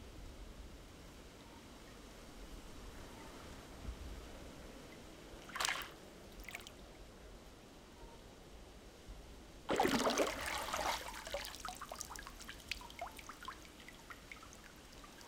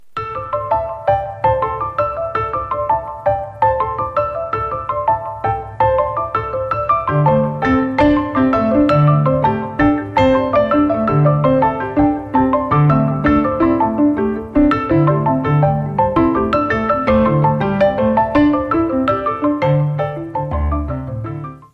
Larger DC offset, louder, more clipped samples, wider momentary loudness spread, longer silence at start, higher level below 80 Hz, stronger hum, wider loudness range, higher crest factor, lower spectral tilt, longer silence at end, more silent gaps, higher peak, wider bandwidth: neither; second, -44 LUFS vs -16 LUFS; neither; first, 19 LU vs 7 LU; about the same, 0 s vs 0 s; second, -58 dBFS vs -34 dBFS; neither; first, 15 LU vs 4 LU; first, 32 dB vs 14 dB; second, -3 dB/octave vs -9.5 dB/octave; about the same, 0 s vs 0.1 s; neither; second, -12 dBFS vs -2 dBFS; first, 18 kHz vs 5.8 kHz